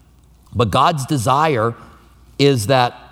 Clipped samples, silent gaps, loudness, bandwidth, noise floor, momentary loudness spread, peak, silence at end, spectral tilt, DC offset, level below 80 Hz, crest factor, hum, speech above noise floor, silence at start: under 0.1%; none; -16 LUFS; 16.5 kHz; -49 dBFS; 12 LU; 0 dBFS; 0.15 s; -5.5 dB/octave; under 0.1%; -48 dBFS; 18 dB; none; 33 dB; 0.55 s